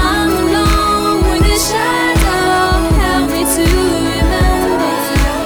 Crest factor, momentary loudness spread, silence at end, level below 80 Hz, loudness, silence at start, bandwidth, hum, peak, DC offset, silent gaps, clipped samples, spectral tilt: 10 dB; 2 LU; 0 s; -18 dBFS; -13 LUFS; 0 s; over 20 kHz; none; -2 dBFS; under 0.1%; none; under 0.1%; -4.5 dB/octave